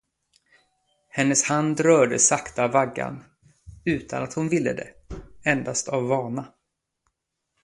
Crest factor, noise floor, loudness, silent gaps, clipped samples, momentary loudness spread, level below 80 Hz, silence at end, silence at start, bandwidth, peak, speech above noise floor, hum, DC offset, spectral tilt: 22 dB; -79 dBFS; -23 LUFS; none; under 0.1%; 16 LU; -54 dBFS; 1.15 s; 1.15 s; 11.5 kHz; -4 dBFS; 56 dB; none; under 0.1%; -4 dB/octave